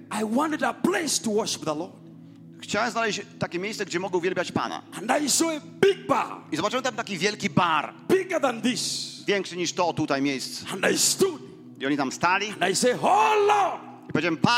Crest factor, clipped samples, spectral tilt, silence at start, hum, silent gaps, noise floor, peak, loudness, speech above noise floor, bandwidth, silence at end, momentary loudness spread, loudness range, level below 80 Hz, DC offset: 20 dB; under 0.1%; -3 dB/octave; 0 s; none; none; -46 dBFS; -6 dBFS; -25 LUFS; 21 dB; 16 kHz; 0 s; 9 LU; 5 LU; -66 dBFS; under 0.1%